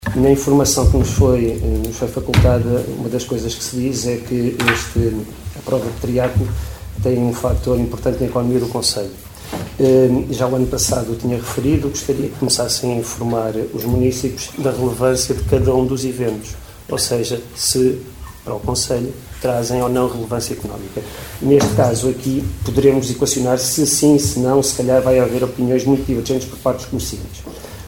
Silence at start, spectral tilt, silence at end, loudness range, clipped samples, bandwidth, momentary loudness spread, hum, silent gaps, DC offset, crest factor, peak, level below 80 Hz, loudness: 0 s; -5 dB/octave; 0 s; 5 LU; under 0.1%; 20 kHz; 13 LU; none; none; 0.2%; 18 dB; 0 dBFS; -30 dBFS; -17 LUFS